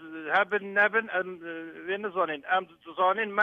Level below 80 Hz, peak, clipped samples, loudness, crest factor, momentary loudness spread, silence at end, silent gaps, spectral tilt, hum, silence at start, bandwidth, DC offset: -78 dBFS; -10 dBFS; under 0.1%; -27 LUFS; 18 dB; 14 LU; 0 s; none; -6 dB/octave; none; 0 s; 7 kHz; under 0.1%